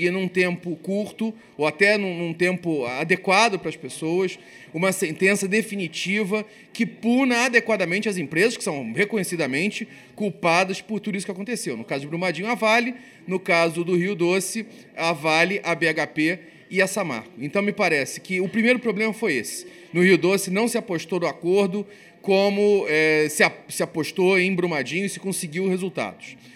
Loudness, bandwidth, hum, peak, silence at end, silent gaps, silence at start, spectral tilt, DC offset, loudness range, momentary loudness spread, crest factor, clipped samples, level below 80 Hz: -22 LUFS; 16 kHz; none; -2 dBFS; 0.05 s; none; 0 s; -4.5 dB/octave; under 0.1%; 3 LU; 11 LU; 20 dB; under 0.1%; -72 dBFS